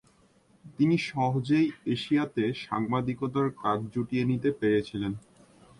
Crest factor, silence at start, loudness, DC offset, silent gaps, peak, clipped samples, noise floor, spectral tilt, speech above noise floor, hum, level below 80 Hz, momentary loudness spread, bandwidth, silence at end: 16 dB; 0.65 s; -28 LUFS; under 0.1%; none; -14 dBFS; under 0.1%; -63 dBFS; -7.5 dB/octave; 35 dB; none; -62 dBFS; 6 LU; 11.5 kHz; 0.6 s